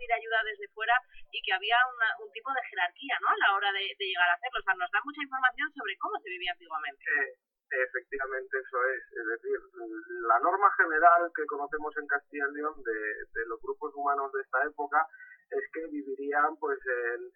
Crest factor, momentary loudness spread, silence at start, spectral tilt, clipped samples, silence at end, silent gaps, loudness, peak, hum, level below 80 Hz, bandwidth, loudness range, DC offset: 22 dB; 11 LU; 0 s; -4.5 dB/octave; under 0.1%; 0.05 s; none; -30 LUFS; -8 dBFS; none; -66 dBFS; 4.7 kHz; 6 LU; under 0.1%